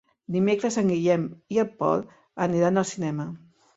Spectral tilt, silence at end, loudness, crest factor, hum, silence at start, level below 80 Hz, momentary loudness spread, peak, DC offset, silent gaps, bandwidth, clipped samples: -6.5 dB/octave; 0.4 s; -25 LUFS; 16 dB; none; 0.3 s; -66 dBFS; 10 LU; -8 dBFS; under 0.1%; none; 8 kHz; under 0.1%